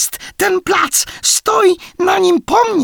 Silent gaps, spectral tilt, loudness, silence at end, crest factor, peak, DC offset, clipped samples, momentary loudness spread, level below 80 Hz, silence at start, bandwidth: none; -1.5 dB/octave; -13 LUFS; 0 s; 12 dB; 0 dBFS; under 0.1%; under 0.1%; 5 LU; -48 dBFS; 0 s; over 20 kHz